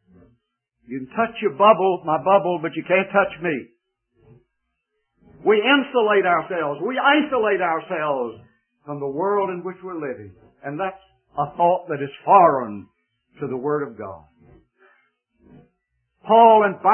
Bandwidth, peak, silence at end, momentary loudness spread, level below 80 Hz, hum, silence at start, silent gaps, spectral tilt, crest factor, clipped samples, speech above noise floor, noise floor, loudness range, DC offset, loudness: 3.3 kHz; 0 dBFS; 0 s; 18 LU; -64 dBFS; none; 0.9 s; none; -10 dB/octave; 20 dB; under 0.1%; 57 dB; -76 dBFS; 8 LU; under 0.1%; -19 LUFS